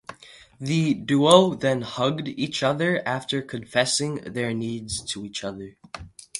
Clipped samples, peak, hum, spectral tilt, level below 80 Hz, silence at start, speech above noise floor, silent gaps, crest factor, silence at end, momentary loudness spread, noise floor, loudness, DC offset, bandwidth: under 0.1%; -2 dBFS; none; -4.5 dB/octave; -56 dBFS; 0.1 s; 25 dB; none; 24 dB; 0 s; 20 LU; -49 dBFS; -23 LUFS; under 0.1%; 11.5 kHz